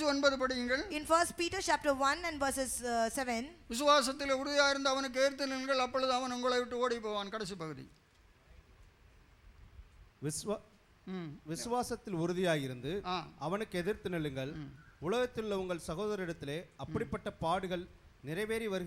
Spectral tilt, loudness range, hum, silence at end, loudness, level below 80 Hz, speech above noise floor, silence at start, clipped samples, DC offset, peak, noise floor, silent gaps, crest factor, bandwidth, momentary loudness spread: -3.5 dB/octave; 13 LU; none; 0 s; -35 LUFS; -60 dBFS; 28 dB; 0 s; under 0.1%; under 0.1%; -14 dBFS; -63 dBFS; none; 20 dB; 16 kHz; 13 LU